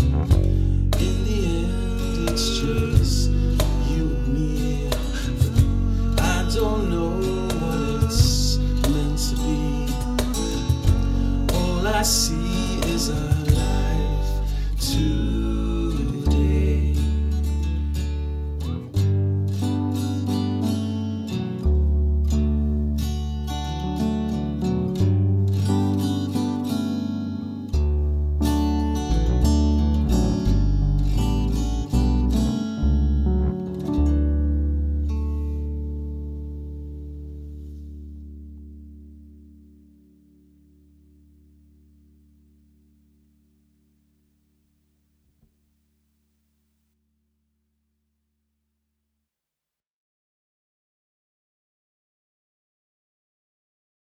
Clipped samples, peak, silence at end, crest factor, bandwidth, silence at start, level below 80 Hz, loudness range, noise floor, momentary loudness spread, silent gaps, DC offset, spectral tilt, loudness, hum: under 0.1%; -4 dBFS; 14.7 s; 18 dB; 15 kHz; 0 s; -26 dBFS; 4 LU; -89 dBFS; 8 LU; none; under 0.1%; -6 dB/octave; -23 LUFS; none